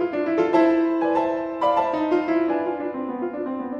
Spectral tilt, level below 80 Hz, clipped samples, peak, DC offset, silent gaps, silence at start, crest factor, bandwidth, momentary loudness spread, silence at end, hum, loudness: -7 dB/octave; -60 dBFS; under 0.1%; -6 dBFS; under 0.1%; none; 0 s; 16 dB; 6.6 kHz; 10 LU; 0 s; none; -22 LUFS